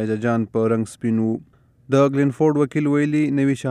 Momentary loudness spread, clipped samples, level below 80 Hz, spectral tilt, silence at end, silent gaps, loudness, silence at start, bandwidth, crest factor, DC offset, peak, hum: 5 LU; under 0.1%; -62 dBFS; -8 dB/octave; 0 s; none; -20 LUFS; 0 s; 11.5 kHz; 16 dB; under 0.1%; -4 dBFS; none